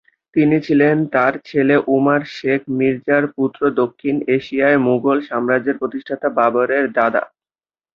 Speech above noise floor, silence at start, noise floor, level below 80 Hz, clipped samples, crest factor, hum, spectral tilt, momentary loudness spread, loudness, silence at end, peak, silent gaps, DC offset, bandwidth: over 74 dB; 0.35 s; under -90 dBFS; -60 dBFS; under 0.1%; 16 dB; none; -8.5 dB/octave; 7 LU; -17 LUFS; 0.7 s; -2 dBFS; none; under 0.1%; 6.6 kHz